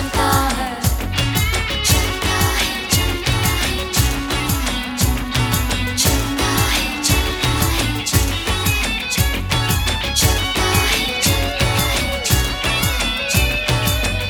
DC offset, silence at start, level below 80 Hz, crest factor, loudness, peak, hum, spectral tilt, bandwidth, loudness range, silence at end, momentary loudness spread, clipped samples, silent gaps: under 0.1%; 0 s; -24 dBFS; 16 dB; -17 LUFS; -2 dBFS; none; -3 dB/octave; over 20 kHz; 1 LU; 0 s; 3 LU; under 0.1%; none